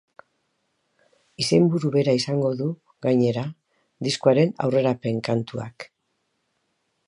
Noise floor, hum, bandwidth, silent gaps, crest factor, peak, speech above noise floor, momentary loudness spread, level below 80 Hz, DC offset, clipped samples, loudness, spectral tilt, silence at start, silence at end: -74 dBFS; none; 11.5 kHz; none; 20 dB; -4 dBFS; 52 dB; 14 LU; -66 dBFS; under 0.1%; under 0.1%; -23 LUFS; -6.5 dB/octave; 1.4 s; 1.25 s